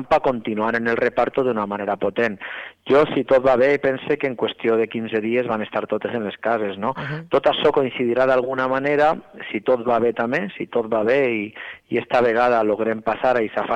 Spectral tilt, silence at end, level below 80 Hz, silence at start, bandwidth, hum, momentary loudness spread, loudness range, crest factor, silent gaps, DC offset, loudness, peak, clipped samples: -7 dB/octave; 0 s; -54 dBFS; 0 s; 8.6 kHz; none; 8 LU; 2 LU; 12 dB; none; under 0.1%; -20 LUFS; -8 dBFS; under 0.1%